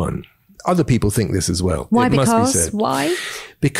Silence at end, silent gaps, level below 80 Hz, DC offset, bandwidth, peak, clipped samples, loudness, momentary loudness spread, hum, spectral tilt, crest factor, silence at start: 0 s; none; -38 dBFS; under 0.1%; 16 kHz; -6 dBFS; under 0.1%; -18 LUFS; 10 LU; none; -5 dB/octave; 12 dB; 0 s